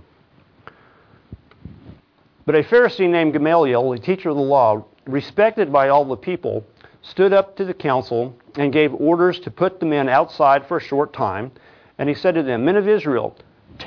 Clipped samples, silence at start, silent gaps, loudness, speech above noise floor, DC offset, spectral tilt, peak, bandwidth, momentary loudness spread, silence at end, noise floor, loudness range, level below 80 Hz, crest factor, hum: under 0.1%; 1.65 s; none; -18 LUFS; 37 dB; under 0.1%; -8.5 dB/octave; -2 dBFS; 5.4 kHz; 10 LU; 0 s; -55 dBFS; 3 LU; -58 dBFS; 16 dB; none